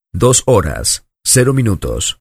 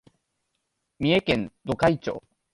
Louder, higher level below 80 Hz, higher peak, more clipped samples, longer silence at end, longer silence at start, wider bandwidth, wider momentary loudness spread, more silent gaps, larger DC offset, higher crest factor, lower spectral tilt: first, -13 LUFS vs -25 LUFS; first, -30 dBFS vs -52 dBFS; first, 0 dBFS vs -8 dBFS; neither; second, 0.05 s vs 0.35 s; second, 0.15 s vs 1 s; first, 15.5 kHz vs 11.5 kHz; second, 7 LU vs 11 LU; neither; neither; second, 14 dB vs 20 dB; second, -4 dB/octave vs -6.5 dB/octave